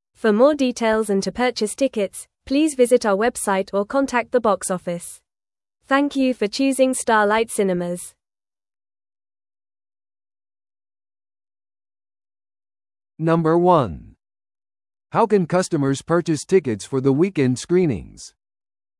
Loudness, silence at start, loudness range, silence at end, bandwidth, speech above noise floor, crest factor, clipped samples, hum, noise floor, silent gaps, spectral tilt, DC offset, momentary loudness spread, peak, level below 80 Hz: -20 LUFS; 0.25 s; 4 LU; 0.7 s; 12 kHz; over 71 dB; 18 dB; under 0.1%; none; under -90 dBFS; none; -5.5 dB/octave; under 0.1%; 10 LU; -2 dBFS; -54 dBFS